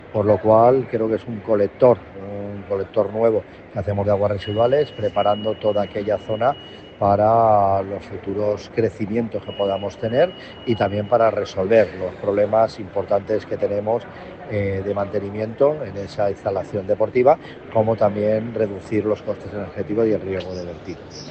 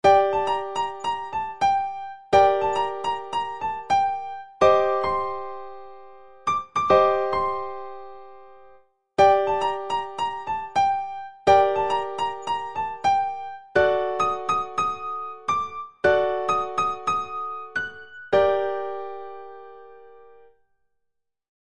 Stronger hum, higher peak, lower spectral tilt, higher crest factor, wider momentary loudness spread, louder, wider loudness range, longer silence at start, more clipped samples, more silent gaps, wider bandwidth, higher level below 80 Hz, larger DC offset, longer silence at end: neither; first, -2 dBFS vs -6 dBFS; first, -7.5 dB/octave vs -4.5 dB/octave; about the same, 18 dB vs 20 dB; second, 13 LU vs 16 LU; about the same, -21 LUFS vs -23 LUFS; about the same, 4 LU vs 4 LU; about the same, 0 s vs 0.05 s; neither; neither; second, 8.2 kHz vs 10.5 kHz; first, -52 dBFS vs -58 dBFS; second, under 0.1% vs 0.4%; second, 0 s vs 0.2 s